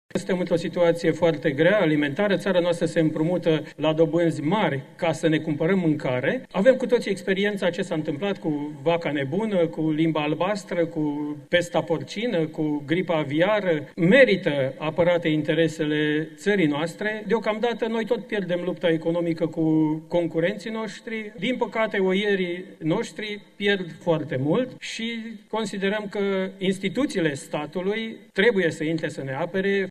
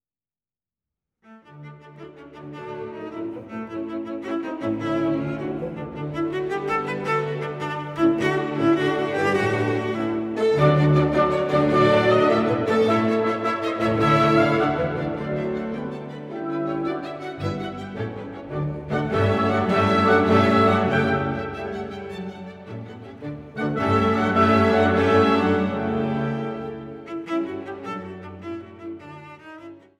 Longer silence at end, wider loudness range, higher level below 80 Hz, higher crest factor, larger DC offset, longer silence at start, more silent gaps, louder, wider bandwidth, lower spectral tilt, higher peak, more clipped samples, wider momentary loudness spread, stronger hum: second, 0 s vs 0.2 s; second, 5 LU vs 12 LU; second, -60 dBFS vs -52 dBFS; about the same, 20 dB vs 18 dB; neither; second, 0.15 s vs 1.3 s; neither; about the same, -24 LUFS vs -22 LUFS; about the same, 12.5 kHz vs 12 kHz; second, -6 dB/octave vs -7.5 dB/octave; about the same, -4 dBFS vs -6 dBFS; neither; second, 7 LU vs 19 LU; neither